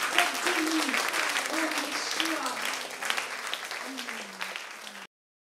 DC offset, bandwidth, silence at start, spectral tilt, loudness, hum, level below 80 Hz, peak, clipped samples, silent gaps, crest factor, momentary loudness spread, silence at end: under 0.1%; 16.5 kHz; 0 s; 0 dB/octave; -29 LUFS; none; -78 dBFS; -4 dBFS; under 0.1%; none; 26 dB; 12 LU; 0.45 s